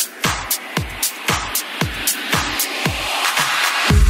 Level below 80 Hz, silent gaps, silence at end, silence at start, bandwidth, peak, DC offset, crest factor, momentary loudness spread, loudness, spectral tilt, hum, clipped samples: -26 dBFS; none; 0 s; 0 s; 16.5 kHz; -4 dBFS; under 0.1%; 16 dB; 5 LU; -18 LUFS; -2.5 dB/octave; none; under 0.1%